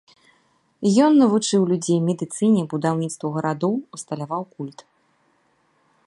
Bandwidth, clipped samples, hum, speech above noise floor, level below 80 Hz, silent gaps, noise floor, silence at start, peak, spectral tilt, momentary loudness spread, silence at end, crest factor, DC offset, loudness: 11.5 kHz; under 0.1%; none; 44 dB; -70 dBFS; none; -64 dBFS; 0.8 s; -6 dBFS; -6 dB/octave; 15 LU; 1.35 s; 16 dB; under 0.1%; -21 LUFS